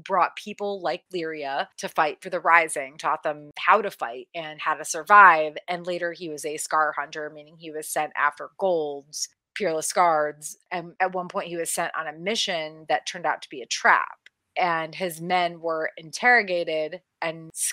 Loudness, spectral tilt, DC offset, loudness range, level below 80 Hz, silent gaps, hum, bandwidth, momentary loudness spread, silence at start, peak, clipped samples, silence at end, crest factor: -24 LUFS; -2 dB/octave; under 0.1%; 7 LU; -82 dBFS; none; none; 16 kHz; 14 LU; 0.05 s; 0 dBFS; under 0.1%; 0 s; 24 dB